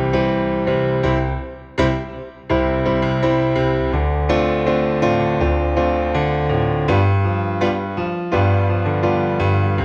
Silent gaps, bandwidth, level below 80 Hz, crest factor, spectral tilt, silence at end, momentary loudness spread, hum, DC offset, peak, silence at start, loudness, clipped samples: none; 7 kHz; -28 dBFS; 16 dB; -8 dB/octave; 0 s; 4 LU; none; under 0.1%; -2 dBFS; 0 s; -19 LUFS; under 0.1%